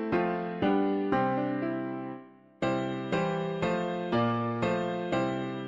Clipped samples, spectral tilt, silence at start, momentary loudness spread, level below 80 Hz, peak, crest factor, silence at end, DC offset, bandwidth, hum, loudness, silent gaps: under 0.1%; -7.5 dB/octave; 0 s; 6 LU; -60 dBFS; -14 dBFS; 16 dB; 0 s; under 0.1%; 7.8 kHz; none; -30 LUFS; none